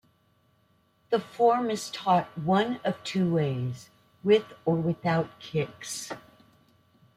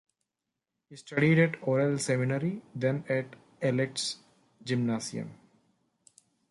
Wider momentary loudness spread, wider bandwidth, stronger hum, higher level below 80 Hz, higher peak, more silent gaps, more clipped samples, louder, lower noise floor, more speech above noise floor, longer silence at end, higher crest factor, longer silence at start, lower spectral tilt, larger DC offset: second, 11 LU vs 17 LU; first, 15.5 kHz vs 11.5 kHz; neither; first, -66 dBFS vs -72 dBFS; about the same, -10 dBFS vs -12 dBFS; neither; neither; about the same, -28 LUFS vs -29 LUFS; second, -67 dBFS vs -87 dBFS; second, 40 dB vs 58 dB; second, 1 s vs 1.15 s; about the same, 18 dB vs 20 dB; first, 1.1 s vs 0.9 s; about the same, -6 dB/octave vs -5.5 dB/octave; neither